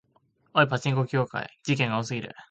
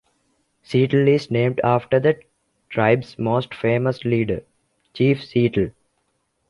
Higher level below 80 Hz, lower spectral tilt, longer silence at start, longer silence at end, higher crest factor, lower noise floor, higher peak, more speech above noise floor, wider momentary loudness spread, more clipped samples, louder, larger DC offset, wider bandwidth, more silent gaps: second, -64 dBFS vs -52 dBFS; second, -6 dB/octave vs -8.5 dB/octave; second, 0.55 s vs 0.7 s; second, 0.05 s vs 0.8 s; about the same, 20 dB vs 18 dB; about the same, -67 dBFS vs -70 dBFS; second, -6 dBFS vs -2 dBFS; second, 41 dB vs 51 dB; first, 10 LU vs 7 LU; neither; second, -27 LUFS vs -20 LUFS; neither; second, 8.4 kHz vs 11 kHz; neither